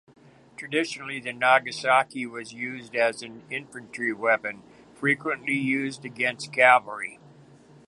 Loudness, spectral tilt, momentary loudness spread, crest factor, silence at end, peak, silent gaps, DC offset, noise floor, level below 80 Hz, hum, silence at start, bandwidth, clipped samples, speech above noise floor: -25 LUFS; -4 dB/octave; 15 LU; 24 dB; 0.75 s; -2 dBFS; none; under 0.1%; -52 dBFS; -74 dBFS; none; 0.6 s; 11.5 kHz; under 0.1%; 27 dB